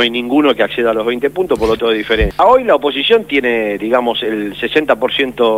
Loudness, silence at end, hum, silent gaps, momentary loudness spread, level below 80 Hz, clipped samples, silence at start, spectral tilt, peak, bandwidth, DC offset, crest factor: -14 LUFS; 0 s; none; none; 6 LU; -32 dBFS; under 0.1%; 0 s; -5.5 dB/octave; 0 dBFS; 16 kHz; 0.2%; 14 dB